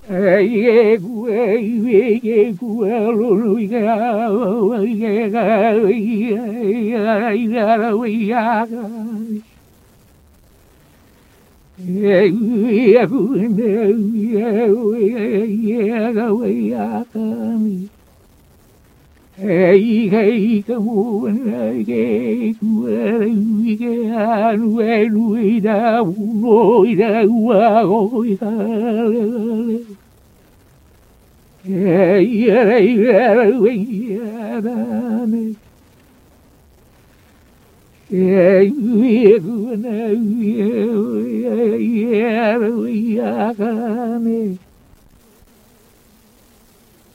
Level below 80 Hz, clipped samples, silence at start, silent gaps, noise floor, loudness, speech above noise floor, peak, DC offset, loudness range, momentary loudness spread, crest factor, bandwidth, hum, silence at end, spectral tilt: -58 dBFS; under 0.1%; 0.05 s; none; -50 dBFS; -16 LUFS; 35 dB; 0 dBFS; under 0.1%; 8 LU; 10 LU; 16 dB; 7 kHz; none; 2.6 s; -8.5 dB/octave